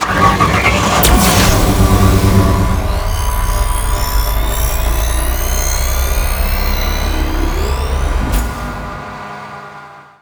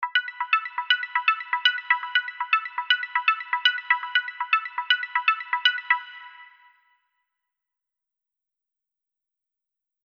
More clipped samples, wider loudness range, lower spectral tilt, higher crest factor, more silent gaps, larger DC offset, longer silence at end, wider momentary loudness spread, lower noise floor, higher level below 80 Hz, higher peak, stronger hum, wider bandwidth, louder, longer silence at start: neither; about the same, 7 LU vs 6 LU; first, -4.5 dB/octave vs 9.5 dB/octave; second, 14 dB vs 24 dB; neither; neither; second, 0.2 s vs 3.6 s; first, 15 LU vs 4 LU; second, -35 dBFS vs -87 dBFS; first, -16 dBFS vs under -90 dBFS; first, 0 dBFS vs -4 dBFS; neither; first, over 20 kHz vs 6.4 kHz; first, -14 LUFS vs -23 LUFS; about the same, 0 s vs 0 s